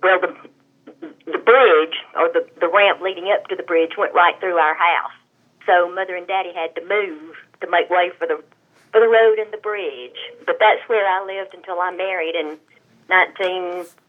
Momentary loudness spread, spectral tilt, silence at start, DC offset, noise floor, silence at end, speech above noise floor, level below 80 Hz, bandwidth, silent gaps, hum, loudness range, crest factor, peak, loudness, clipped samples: 14 LU; -4 dB/octave; 0 s; under 0.1%; -48 dBFS; 0.25 s; 29 dB; -90 dBFS; 4.5 kHz; none; none; 4 LU; 18 dB; 0 dBFS; -18 LUFS; under 0.1%